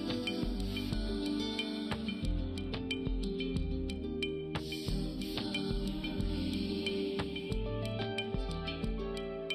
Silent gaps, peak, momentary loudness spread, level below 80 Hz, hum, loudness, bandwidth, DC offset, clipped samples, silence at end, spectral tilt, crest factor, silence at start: none; -18 dBFS; 3 LU; -42 dBFS; none; -37 LUFS; 14.5 kHz; under 0.1%; under 0.1%; 0 s; -6 dB/octave; 18 dB; 0 s